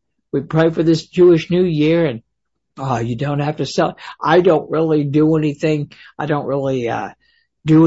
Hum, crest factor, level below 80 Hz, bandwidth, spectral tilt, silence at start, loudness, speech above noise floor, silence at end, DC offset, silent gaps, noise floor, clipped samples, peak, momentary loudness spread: none; 14 dB; -50 dBFS; 8 kHz; -7.5 dB/octave; 0.35 s; -17 LUFS; 45 dB; 0 s; under 0.1%; none; -61 dBFS; under 0.1%; -2 dBFS; 12 LU